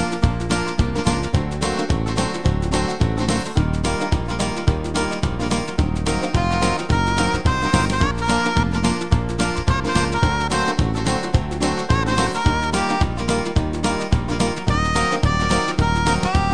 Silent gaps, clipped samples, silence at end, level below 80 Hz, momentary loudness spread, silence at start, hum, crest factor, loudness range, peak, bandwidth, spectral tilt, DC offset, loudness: none; under 0.1%; 0 s; -28 dBFS; 4 LU; 0 s; none; 18 dB; 2 LU; 0 dBFS; 10 kHz; -5 dB/octave; 2%; -20 LUFS